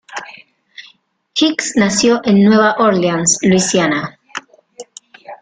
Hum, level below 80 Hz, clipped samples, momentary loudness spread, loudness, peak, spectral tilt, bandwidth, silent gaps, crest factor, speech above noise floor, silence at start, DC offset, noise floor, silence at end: none; -54 dBFS; under 0.1%; 19 LU; -13 LUFS; 0 dBFS; -4 dB/octave; 9.6 kHz; none; 14 dB; 39 dB; 0.1 s; under 0.1%; -51 dBFS; 0.05 s